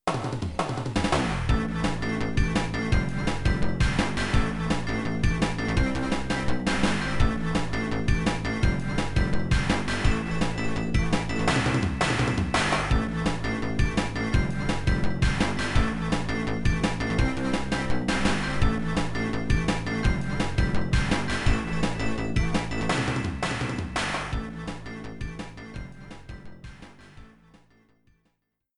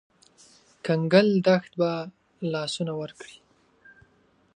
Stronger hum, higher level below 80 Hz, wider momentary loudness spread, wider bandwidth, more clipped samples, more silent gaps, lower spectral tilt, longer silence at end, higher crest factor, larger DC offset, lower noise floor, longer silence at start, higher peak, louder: neither; first, -32 dBFS vs -70 dBFS; second, 5 LU vs 20 LU; about the same, 11.5 kHz vs 10.5 kHz; neither; neither; about the same, -5.5 dB/octave vs -6 dB/octave; first, 1.5 s vs 1.3 s; second, 16 dB vs 22 dB; neither; first, -76 dBFS vs -63 dBFS; second, 0.05 s vs 0.85 s; second, -8 dBFS vs -4 dBFS; about the same, -27 LUFS vs -25 LUFS